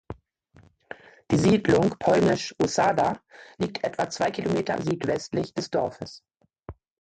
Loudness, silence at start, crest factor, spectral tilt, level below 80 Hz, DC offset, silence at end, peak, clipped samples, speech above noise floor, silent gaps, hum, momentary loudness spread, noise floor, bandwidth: -25 LUFS; 0.1 s; 18 dB; -5.5 dB/octave; -54 dBFS; under 0.1%; 0.3 s; -8 dBFS; under 0.1%; 33 dB; none; none; 21 LU; -58 dBFS; 9.2 kHz